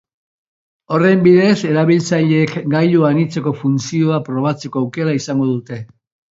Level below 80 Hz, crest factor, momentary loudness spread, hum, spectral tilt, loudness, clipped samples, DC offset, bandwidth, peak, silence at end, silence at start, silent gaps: -60 dBFS; 14 dB; 9 LU; none; -7 dB/octave; -15 LUFS; under 0.1%; under 0.1%; 7.8 kHz; 0 dBFS; 0.45 s; 0.9 s; none